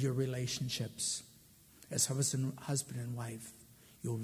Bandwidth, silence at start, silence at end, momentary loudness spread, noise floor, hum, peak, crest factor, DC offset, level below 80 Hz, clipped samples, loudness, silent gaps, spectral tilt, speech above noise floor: 16 kHz; 0 s; 0 s; 15 LU; -62 dBFS; none; -18 dBFS; 20 dB; under 0.1%; -68 dBFS; under 0.1%; -37 LUFS; none; -4 dB/octave; 25 dB